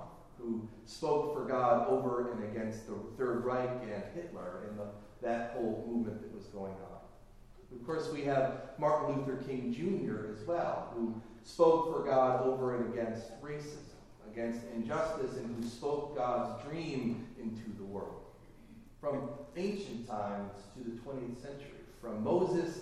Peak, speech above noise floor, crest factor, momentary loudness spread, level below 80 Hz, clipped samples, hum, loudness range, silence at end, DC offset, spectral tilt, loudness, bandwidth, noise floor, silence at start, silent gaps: -14 dBFS; 20 dB; 22 dB; 16 LU; -60 dBFS; under 0.1%; none; 9 LU; 0 s; under 0.1%; -7 dB/octave; -36 LUFS; 13 kHz; -56 dBFS; 0 s; none